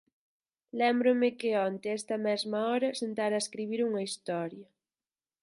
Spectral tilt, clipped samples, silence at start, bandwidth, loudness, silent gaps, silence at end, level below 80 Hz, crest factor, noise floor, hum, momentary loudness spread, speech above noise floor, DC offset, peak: -4.5 dB/octave; under 0.1%; 0.75 s; 11.5 kHz; -31 LUFS; none; 0.8 s; -84 dBFS; 16 dB; under -90 dBFS; none; 9 LU; over 60 dB; under 0.1%; -14 dBFS